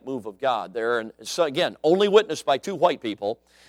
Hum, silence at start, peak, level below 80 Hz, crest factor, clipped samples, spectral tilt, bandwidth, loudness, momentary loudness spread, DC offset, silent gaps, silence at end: none; 0.05 s; -4 dBFS; -70 dBFS; 20 dB; under 0.1%; -4 dB/octave; 15 kHz; -23 LUFS; 11 LU; under 0.1%; none; 0.35 s